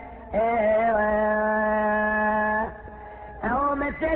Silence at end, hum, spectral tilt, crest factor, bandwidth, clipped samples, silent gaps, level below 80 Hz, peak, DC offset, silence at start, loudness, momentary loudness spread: 0 s; none; -10 dB/octave; 12 dB; 4 kHz; under 0.1%; none; -44 dBFS; -12 dBFS; under 0.1%; 0 s; -23 LUFS; 14 LU